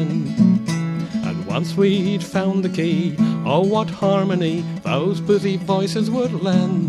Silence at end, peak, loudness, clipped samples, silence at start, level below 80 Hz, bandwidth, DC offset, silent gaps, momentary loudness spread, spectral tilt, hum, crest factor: 0 s; -4 dBFS; -20 LUFS; under 0.1%; 0 s; -56 dBFS; 12 kHz; under 0.1%; none; 6 LU; -7 dB/octave; none; 14 dB